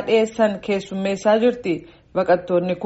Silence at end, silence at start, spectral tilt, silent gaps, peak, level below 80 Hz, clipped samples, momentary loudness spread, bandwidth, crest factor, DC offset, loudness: 0 s; 0 s; -4.5 dB/octave; none; -4 dBFS; -56 dBFS; under 0.1%; 9 LU; 8 kHz; 16 dB; under 0.1%; -20 LUFS